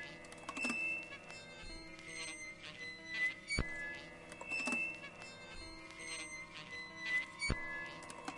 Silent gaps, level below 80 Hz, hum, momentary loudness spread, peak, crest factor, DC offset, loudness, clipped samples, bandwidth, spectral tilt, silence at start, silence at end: none; -56 dBFS; none; 13 LU; -18 dBFS; 26 dB; under 0.1%; -42 LUFS; under 0.1%; 11.5 kHz; -3 dB/octave; 0 s; 0 s